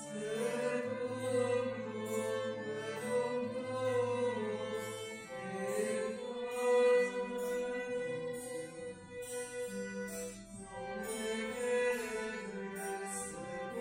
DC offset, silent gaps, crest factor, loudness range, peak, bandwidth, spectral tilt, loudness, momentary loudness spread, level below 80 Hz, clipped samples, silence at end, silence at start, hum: under 0.1%; none; 16 dB; 6 LU; -20 dBFS; 16 kHz; -4 dB/octave; -37 LUFS; 10 LU; -70 dBFS; under 0.1%; 0 s; 0 s; none